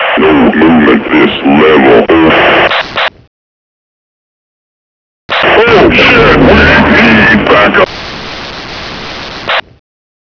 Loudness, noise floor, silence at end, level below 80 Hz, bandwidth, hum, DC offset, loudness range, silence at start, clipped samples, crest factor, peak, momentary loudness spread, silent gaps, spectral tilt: -5 LUFS; under -90 dBFS; 0.7 s; -26 dBFS; 5.4 kHz; none; 0.3%; 7 LU; 0 s; 2%; 8 dB; 0 dBFS; 16 LU; 3.27-5.29 s; -6.5 dB/octave